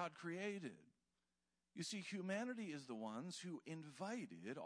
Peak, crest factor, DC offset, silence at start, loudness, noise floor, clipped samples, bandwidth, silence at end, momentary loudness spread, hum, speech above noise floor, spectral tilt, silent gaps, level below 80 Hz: -32 dBFS; 18 dB; under 0.1%; 0 s; -49 LUFS; under -90 dBFS; under 0.1%; 11 kHz; 0 s; 8 LU; none; over 41 dB; -4.5 dB/octave; none; under -90 dBFS